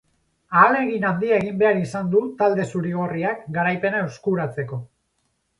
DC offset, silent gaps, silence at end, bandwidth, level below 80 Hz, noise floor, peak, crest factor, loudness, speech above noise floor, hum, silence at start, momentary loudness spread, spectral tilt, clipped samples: under 0.1%; none; 0.75 s; 11.5 kHz; -60 dBFS; -71 dBFS; -2 dBFS; 20 dB; -21 LUFS; 50 dB; none; 0.5 s; 9 LU; -7.5 dB/octave; under 0.1%